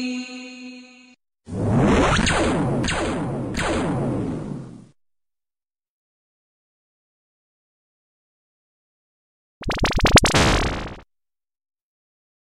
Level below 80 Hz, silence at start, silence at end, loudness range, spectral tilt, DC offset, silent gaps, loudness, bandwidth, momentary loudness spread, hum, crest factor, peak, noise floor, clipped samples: -34 dBFS; 0 s; 1.45 s; 11 LU; -4.5 dB/octave; under 0.1%; 5.88-9.61 s; -20 LUFS; 15.5 kHz; 20 LU; none; 20 dB; -4 dBFS; under -90 dBFS; under 0.1%